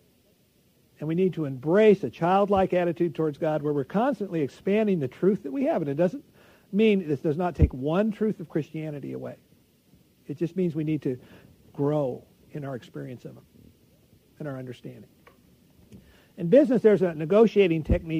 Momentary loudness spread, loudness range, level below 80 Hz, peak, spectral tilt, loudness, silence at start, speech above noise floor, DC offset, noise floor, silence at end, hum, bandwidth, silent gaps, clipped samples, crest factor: 19 LU; 14 LU; -44 dBFS; -6 dBFS; -8.5 dB/octave; -25 LUFS; 1 s; 39 dB; under 0.1%; -63 dBFS; 0 s; none; 15 kHz; none; under 0.1%; 20 dB